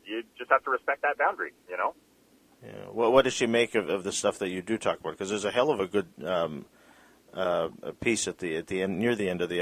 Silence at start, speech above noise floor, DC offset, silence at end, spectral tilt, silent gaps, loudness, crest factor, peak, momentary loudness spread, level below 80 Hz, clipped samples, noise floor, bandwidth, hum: 0.05 s; 33 dB; under 0.1%; 0 s; -4 dB/octave; none; -28 LUFS; 22 dB; -6 dBFS; 10 LU; -62 dBFS; under 0.1%; -61 dBFS; 15.5 kHz; none